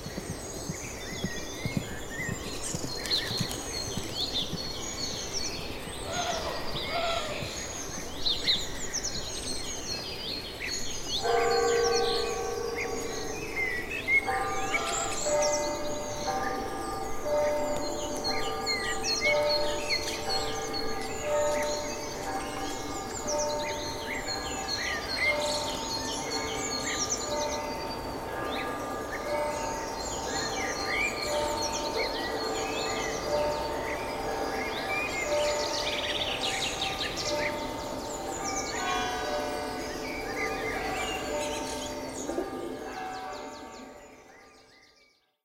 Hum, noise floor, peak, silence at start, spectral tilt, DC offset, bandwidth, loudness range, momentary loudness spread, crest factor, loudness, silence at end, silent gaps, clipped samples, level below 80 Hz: none; -65 dBFS; -12 dBFS; 0 s; -2.5 dB/octave; under 0.1%; 16 kHz; 4 LU; 8 LU; 20 dB; -31 LUFS; 0.7 s; none; under 0.1%; -48 dBFS